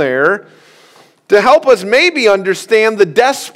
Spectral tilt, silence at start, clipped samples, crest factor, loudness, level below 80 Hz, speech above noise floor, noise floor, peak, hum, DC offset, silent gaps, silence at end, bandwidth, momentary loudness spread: -3.5 dB/octave; 0 s; 0.5%; 12 dB; -11 LUFS; -56 dBFS; 34 dB; -45 dBFS; 0 dBFS; none; under 0.1%; none; 0.05 s; 15.5 kHz; 5 LU